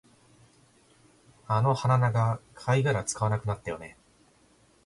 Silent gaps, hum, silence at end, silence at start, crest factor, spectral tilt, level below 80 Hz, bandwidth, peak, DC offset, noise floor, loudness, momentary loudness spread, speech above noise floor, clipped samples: none; none; 0.95 s; 1.5 s; 18 dB; -6 dB/octave; -58 dBFS; 11.5 kHz; -12 dBFS; under 0.1%; -62 dBFS; -27 LUFS; 12 LU; 36 dB; under 0.1%